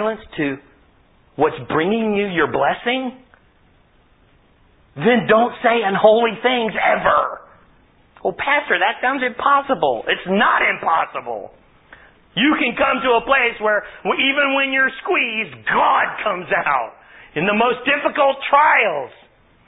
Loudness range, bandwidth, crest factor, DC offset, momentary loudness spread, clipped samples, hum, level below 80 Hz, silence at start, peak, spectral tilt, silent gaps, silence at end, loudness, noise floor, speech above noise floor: 4 LU; 4 kHz; 18 dB; under 0.1%; 10 LU; under 0.1%; none; -54 dBFS; 0 s; -2 dBFS; -9.5 dB/octave; none; 0.6 s; -17 LUFS; -54 dBFS; 37 dB